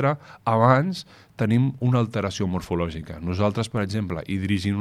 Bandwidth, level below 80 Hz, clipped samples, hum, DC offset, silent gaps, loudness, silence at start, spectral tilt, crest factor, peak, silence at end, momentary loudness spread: 12.5 kHz; -48 dBFS; under 0.1%; none; under 0.1%; none; -24 LUFS; 0 s; -7 dB/octave; 20 dB; -4 dBFS; 0 s; 11 LU